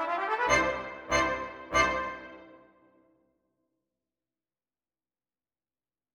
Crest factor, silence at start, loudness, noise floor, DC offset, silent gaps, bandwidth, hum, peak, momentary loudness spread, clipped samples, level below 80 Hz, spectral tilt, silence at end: 22 dB; 0 s; -28 LUFS; under -90 dBFS; under 0.1%; none; 16 kHz; none; -10 dBFS; 13 LU; under 0.1%; -52 dBFS; -3 dB/octave; 3.55 s